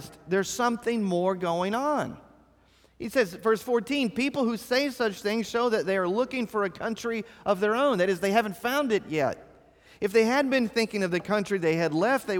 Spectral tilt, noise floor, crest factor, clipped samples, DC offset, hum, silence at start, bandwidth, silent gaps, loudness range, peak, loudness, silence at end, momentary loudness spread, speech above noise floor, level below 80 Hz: -5 dB/octave; -61 dBFS; 16 dB; under 0.1%; under 0.1%; none; 0 s; 19.5 kHz; none; 2 LU; -10 dBFS; -27 LUFS; 0 s; 6 LU; 35 dB; -64 dBFS